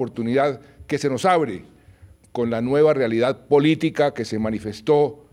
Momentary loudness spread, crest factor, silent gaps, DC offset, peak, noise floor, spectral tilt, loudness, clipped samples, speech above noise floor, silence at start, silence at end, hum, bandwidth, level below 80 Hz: 10 LU; 16 dB; none; under 0.1%; -6 dBFS; -49 dBFS; -6.5 dB/octave; -21 LUFS; under 0.1%; 29 dB; 0 s; 0.15 s; none; 11.5 kHz; -56 dBFS